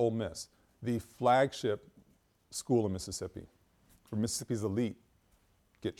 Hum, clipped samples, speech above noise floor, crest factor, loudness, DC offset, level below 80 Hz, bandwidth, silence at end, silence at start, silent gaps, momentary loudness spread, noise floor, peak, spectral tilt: none; under 0.1%; 37 dB; 20 dB; -34 LUFS; under 0.1%; -64 dBFS; 17.5 kHz; 0.1 s; 0 s; none; 16 LU; -69 dBFS; -16 dBFS; -5 dB/octave